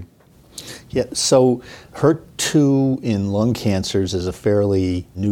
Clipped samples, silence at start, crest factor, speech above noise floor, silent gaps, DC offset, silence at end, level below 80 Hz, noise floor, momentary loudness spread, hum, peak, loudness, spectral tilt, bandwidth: under 0.1%; 0 s; 16 dB; 32 dB; none; under 0.1%; 0 s; -46 dBFS; -50 dBFS; 13 LU; none; -2 dBFS; -19 LUFS; -5.5 dB/octave; 17 kHz